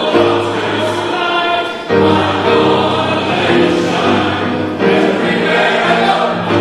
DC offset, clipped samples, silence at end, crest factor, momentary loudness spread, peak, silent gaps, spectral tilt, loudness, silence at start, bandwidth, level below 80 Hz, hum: under 0.1%; under 0.1%; 0 s; 12 dB; 4 LU; 0 dBFS; none; -5.5 dB/octave; -13 LUFS; 0 s; 12.5 kHz; -50 dBFS; none